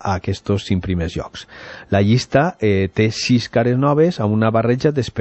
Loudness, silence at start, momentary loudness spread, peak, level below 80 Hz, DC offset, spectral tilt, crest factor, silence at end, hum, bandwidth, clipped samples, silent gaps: -18 LUFS; 0 s; 10 LU; -2 dBFS; -42 dBFS; under 0.1%; -6.5 dB/octave; 16 dB; 0 s; none; 8.4 kHz; under 0.1%; none